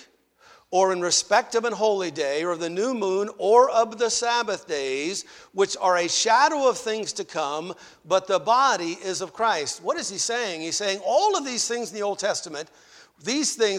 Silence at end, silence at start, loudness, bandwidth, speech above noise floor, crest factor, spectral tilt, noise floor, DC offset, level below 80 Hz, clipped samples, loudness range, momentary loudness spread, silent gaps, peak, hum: 0 s; 0.7 s; -23 LUFS; 15.5 kHz; 32 dB; 20 dB; -2 dB/octave; -56 dBFS; under 0.1%; -70 dBFS; under 0.1%; 3 LU; 10 LU; none; -4 dBFS; none